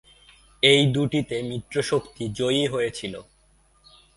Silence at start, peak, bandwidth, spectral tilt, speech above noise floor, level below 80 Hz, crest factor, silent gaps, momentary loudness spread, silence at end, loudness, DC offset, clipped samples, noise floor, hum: 0.65 s; -2 dBFS; 11.5 kHz; -5 dB/octave; 37 dB; -56 dBFS; 22 dB; none; 16 LU; 0.95 s; -23 LUFS; under 0.1%; under 0.1%; -60 dBFS; none